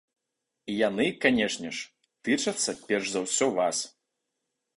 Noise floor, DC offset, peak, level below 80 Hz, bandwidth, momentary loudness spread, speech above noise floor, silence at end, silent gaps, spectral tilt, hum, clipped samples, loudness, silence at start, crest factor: -84 dBFS; under 0.1%; -6 dBFS; -66 dBFS; 11.5 kHz; 13 LU; 57 dB; 0.9 s; none; -2.5 dB/octave; none; under 0.1%; -27 LUFS; 0.65 s; 22 dB